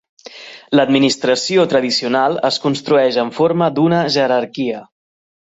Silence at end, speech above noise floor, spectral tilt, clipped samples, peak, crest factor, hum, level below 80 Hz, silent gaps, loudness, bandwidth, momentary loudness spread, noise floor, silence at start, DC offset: 0.75 s; 22 dB; -5 dB/octave; under 0.1%; -2 dBFS; 14 dB; none; -60 dBFS; none; -15 LUFS; 8.2 kHz; 9 LU; -37 dBFS; 0.25 s; under 0.1%